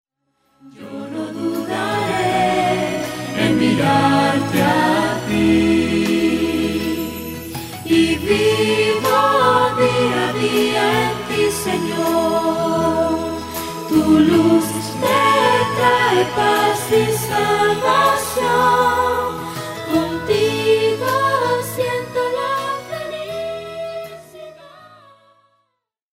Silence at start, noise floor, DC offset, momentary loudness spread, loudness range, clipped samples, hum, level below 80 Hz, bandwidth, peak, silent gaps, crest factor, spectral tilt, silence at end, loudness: 0.65 s; -73 dBFS; under 0.1%; 12 LU; 6 LU; under 0.1%; none; -46 dBFS; 16 kHz; -2 dBFS; none; 16 dB; -4.5 dB/octave; 1.25 s; -17 LUFS